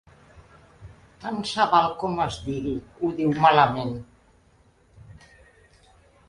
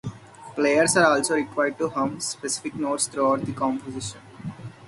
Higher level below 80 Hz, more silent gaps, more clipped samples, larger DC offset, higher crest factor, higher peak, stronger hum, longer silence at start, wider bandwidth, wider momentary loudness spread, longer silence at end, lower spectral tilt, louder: first, -52 dBFS vs -60 dBFS; neither; neither; neither; about the same, 22 dB vs 20 dB; about the same, -4 dBFS vs -4 dBFS; neither; first, 0.35 s vs 0.05 s; about the same, 11 kHz vs 12 kHz; second, 15 LU vs 19 LU; first, 1.15 s vs 0 s; first, -5.5 dB/octave vs -3.5 dB/octave; about the same, -23 LUFS vs -23 LUFS